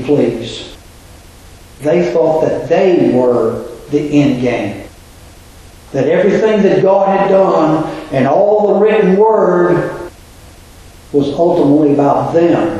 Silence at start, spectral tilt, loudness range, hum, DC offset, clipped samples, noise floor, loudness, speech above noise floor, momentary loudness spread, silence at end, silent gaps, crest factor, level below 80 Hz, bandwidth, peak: 0 s; -7.5 dB/octave; 4 LU; none; under 0.1%; under 0.1%; -37 dBFS; -12 LUFS; 26 dB; 12 LU; 0 s; none; 12 dB; -42 dBFS; 12.5 kHz; 0 dBFS